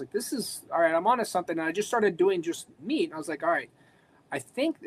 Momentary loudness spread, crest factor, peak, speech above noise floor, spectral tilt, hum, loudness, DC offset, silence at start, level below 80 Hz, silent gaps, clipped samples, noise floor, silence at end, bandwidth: 11 LU; 16 dB; -12 dBFS; 33 dB; -4 dB/octave; none; -28 LUFS; under 0.1%; 0 s; -76 dBFS; none; under 0.1%; -61 dBFS; 0 s; 15.5 kHz